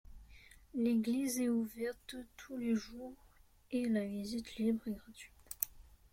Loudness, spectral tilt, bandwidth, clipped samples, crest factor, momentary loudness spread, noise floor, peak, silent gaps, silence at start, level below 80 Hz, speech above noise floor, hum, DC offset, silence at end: -38 LUFS; -5 dB/octave; 16.5 kHz; under 0.1%; 26 dB; 16 LU; -60 dBFS; -12 dBFS; none; 0.05 s; -64 dBFS; 22 dB; none; under 0.1%; 0.25 s